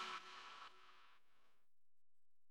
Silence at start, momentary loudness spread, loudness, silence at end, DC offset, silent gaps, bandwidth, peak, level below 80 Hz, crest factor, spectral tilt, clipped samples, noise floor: 0 s; 16 LU; -55 LUFS; 0 s; under 0.1%; none; 13 kHz; -36 dBFS; under -90 dBFS; 22 dB; -0.5 dB/octave; under 0.1%; -82 dBFS